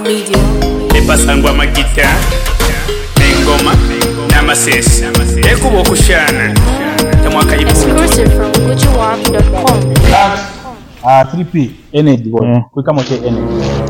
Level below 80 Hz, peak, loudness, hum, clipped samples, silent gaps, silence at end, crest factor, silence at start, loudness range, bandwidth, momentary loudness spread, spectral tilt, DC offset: -14 dBFS; 0 dBFS; -10 LUFS; none; 0.1%; none; 0 s; 10 dB; 0 s; 2 LU; 17.5 kHz; 6 LU; -4.5 dB/octave; under 0.1%